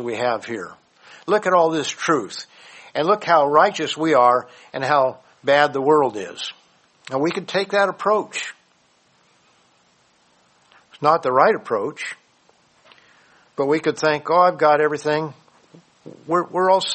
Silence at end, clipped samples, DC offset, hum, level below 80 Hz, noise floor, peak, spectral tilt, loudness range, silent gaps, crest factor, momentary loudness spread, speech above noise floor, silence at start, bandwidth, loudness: 0 s; under 0.1%; under 0.1%; none; -70 dBFS; -60 dBFS; -2 dBFS; -4.5 dB/octave; 6 LU; none; 20 dB; 16 LU; 41 dB; 0 s; 8.8 kHz; -19 LUFS